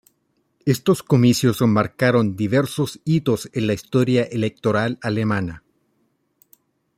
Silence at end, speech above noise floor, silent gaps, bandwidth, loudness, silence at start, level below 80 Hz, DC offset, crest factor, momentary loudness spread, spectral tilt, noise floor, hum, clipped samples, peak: 1.4 s; 49 dB; none; 16 kHz; -20 LUFS; 0.65 s; -56 dBFS; under 0.1%; 18 dB; 7 LU; -6.5 dB/octave; -68 dBFS; none; under 0.1%; -4 dBFS